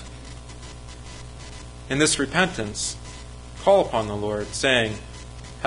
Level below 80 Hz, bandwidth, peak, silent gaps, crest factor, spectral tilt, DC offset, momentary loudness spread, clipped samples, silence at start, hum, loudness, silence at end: -42 dBFS; 11.5 kHz; -4 dBFS; none; 22 dB; -3.5 dB/octave; under 0.1%; 20 LU; under 0.1%; 0 s; 60 Hz at -40 dBFS; -22 LUFS; 0 s